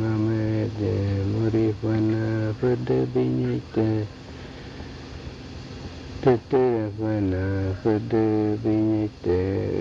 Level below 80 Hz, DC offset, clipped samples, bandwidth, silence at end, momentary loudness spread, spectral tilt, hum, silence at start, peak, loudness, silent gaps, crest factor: -48 dBFS; under 0.1%; under 0.1%; 7.4 kHz; 0 s; 16 LU; -9 dB/octave; none; 0 s; -8 dBFS; -24 LUFS; none; 16 dB